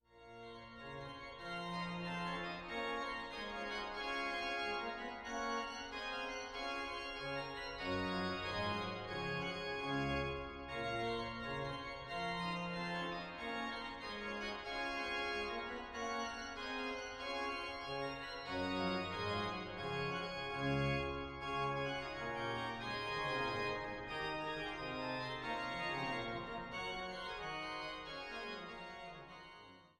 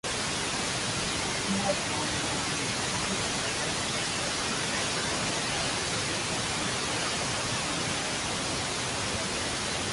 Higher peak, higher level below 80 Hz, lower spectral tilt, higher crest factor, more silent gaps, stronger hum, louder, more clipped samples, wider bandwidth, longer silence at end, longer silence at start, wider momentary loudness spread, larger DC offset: second, -26 dBFS vs -14 dBFS; second, -60 dBFS vs -50 dBFS; first, -5 dB/octave vs -2 dB/octave; about the same, 16 dB vs 16 dB; neither; neither; second, -42 LUFS vs -28 LUFS; neither; first, 14 kHz vs 12 kHz; about the same, 0.1 s vs 0 s; about the same, 0.1 s vs 0.05 s; first, 7 LU vs 1 LU; neither